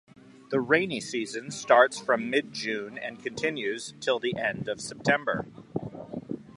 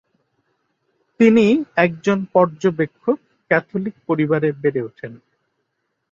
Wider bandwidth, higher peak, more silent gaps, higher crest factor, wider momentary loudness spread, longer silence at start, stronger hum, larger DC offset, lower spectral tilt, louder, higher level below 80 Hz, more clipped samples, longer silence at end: first, 11.5 kHz vs 7.4 kHz; about the same, -4 dBFS vs -2 dBFS; neither; first, 24 dB vs 18 dB; about the same, 14 LU vs 12 LU; second, 0.5 s vs 1.2 s; neither; neither; second, -4 dB/octave vs -7.5 dB/octave; second, -28 LUFS vs -18 LUFS; about the same, -66 dBFS vs -62 dBFS; neither; second, 0.05 s vs 0.95 s